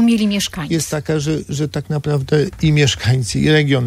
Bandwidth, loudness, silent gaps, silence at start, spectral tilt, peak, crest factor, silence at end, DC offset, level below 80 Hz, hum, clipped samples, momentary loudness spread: 15 kHz; -17 LUFS; none; 0 s; -5.5 dB/octave; -2 dBFS; 14 dB; 0 s; under 0.1%; -40 dBFS; none; under 0.1%; 7 LU